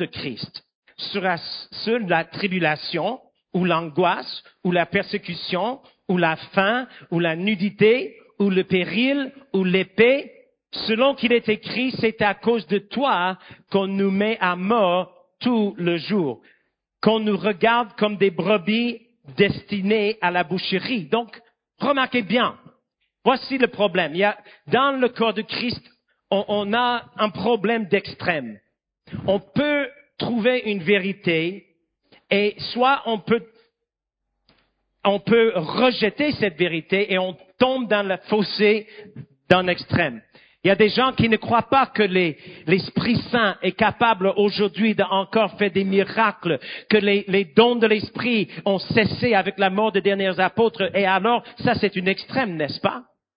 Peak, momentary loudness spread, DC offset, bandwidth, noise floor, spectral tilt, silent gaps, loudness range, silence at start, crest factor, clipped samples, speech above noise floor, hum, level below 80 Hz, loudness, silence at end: 0 dBFS; 9 LU; under 0.1%; 5.2 kHz; -83 dBFS; -9 dB/octave; 0.75-0.82 s; 4 LU; 0 s; 22 dB; under 0.1%; 62 dB; none; -56 dBFS; -21 LUFS; 0.35 s